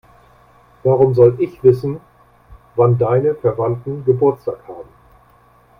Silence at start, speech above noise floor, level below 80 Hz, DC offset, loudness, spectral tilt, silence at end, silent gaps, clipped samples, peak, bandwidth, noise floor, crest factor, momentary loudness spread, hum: 0.85 s; 36 dB; -50 dBFS; under 0.1%; -16 LUFS; -11 dB/octave; 0.95 s; none; under 0.1%; 0 dBFS; 5.4 kHz; -51 dBFS; 18 dB; 15 LU; none